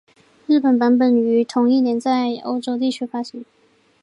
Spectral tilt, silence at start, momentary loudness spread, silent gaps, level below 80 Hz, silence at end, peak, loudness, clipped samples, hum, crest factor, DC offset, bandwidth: -5.5 dB/octave; 0.5 s; 13 LU; none; -74 dBFS; 0.6 s; -6 dBFS; -18 LUFS; under 0.1%; none; 12 dB; under 0.1%; 10.5 kHz